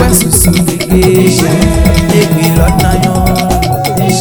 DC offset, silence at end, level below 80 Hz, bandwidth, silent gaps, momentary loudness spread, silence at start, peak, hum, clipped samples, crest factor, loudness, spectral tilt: under 0.1%; 0 s; -16 dBFS; over 20 kHz; none; 4 LU; 0 s; 0 dBFS; none; 2%; 8 dB; -9 LUFS; -5 dB/octave